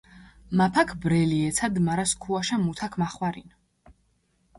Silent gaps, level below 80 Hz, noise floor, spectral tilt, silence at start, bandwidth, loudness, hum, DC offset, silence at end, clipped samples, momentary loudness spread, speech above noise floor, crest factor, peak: none; -52 dBFS; -68 dBFS; -5 dB/octave; 0.15 s; 11.5 kHz; -25 LUFS; none; under 0.1%; 0.65 s; under 0.1%; 7 LU; 43 dB; 20 dB; -8 dBFS